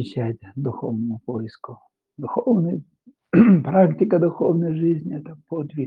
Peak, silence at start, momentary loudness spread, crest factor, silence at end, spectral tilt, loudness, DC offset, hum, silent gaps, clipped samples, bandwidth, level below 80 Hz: -2 dBFS; 0 s; 17 LU; 18 dB; 0 s; -11 dB/octave; -21 LUFS; under 0.1%; none; none; under 0.1%; 4.9 kHz; -64 dBFS